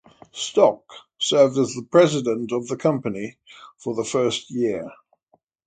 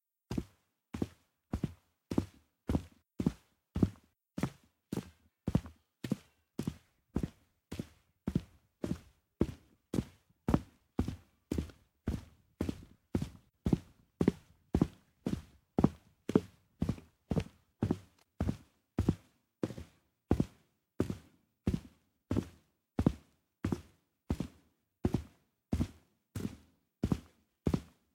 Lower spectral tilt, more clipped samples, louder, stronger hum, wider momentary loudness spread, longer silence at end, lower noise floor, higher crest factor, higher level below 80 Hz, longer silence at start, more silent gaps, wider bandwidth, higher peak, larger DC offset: second, -4.5 dB/octave vs -8 dB/octave; neither; first, -21 LUFS vs -39 LUFS; neither; about the same, 16 LU vs 14 LU; first, 0.75 s vs 0.3 s; second, -65 dBFS vs -70 dBFS; second, 20 dB vs 28 dB; second, -64 dBFS vs -50 dBFS; about the same, 0.35 s vs 0.3 s; neither; second, 9.4 kHz vs 16.5 kHz; first, -2 dBFS vs -10 dBFS; neither